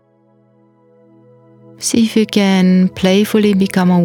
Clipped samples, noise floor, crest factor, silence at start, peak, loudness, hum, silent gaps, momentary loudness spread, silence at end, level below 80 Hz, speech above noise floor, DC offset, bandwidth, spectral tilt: under 0.1%; -53 dBFS; 14 dB; 1.8 s; 0 dBFS; -13 LUFS; none; none; 3 LU; 0 s; -52 dBFS; 41 dB; under 0.1%; 17.5 kHz; -5.5 dB/octave